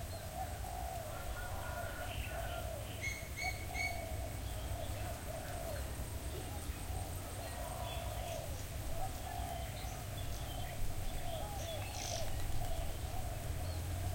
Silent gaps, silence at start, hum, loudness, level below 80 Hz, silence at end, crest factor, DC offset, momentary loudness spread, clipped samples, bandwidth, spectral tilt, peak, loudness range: none; 0 s; none; -43 LUFS; -46 dBFS; 0 s; 16 dB; under 0.1%; 4 LU; under 0.1%; 16.5 kHz; -4 dB/octave; -26 dBFS; 2 LU